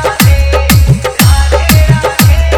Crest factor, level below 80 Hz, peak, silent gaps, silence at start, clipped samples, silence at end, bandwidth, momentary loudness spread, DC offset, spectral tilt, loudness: 6 dB; -10 dBFS; 0 dBFS; none; 0 s; 2%; 0 s; over 20 kHz; 2 LU; under 0.1%; -5 dB/octave; -8 LUFS